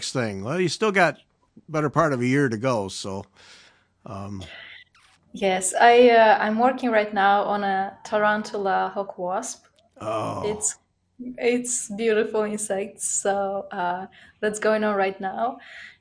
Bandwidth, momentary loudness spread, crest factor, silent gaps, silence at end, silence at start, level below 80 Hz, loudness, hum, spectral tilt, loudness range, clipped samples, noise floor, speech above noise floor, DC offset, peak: 10.5 kHz; 18 LU; 20 dB; none; 0.1 s; 0 s; -64 dBFS; -22 LUFS; none; -4 dB/octave; 8 LU; under 0.1%; -59 dBFS; 36 dB; under 0.1%; -2 dBFS